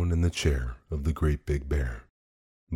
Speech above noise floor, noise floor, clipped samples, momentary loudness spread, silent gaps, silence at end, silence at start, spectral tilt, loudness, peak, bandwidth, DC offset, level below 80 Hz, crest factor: over 63 dB; under -90 dBFS; under 0.1%; 9 LU; 2.10-2.67 s; 0 s; 0 s; -6 dB/octave; -29 LUFS; -14 dBFS; 13 kHz; under 0.1%; -32 dBFS; 16 dB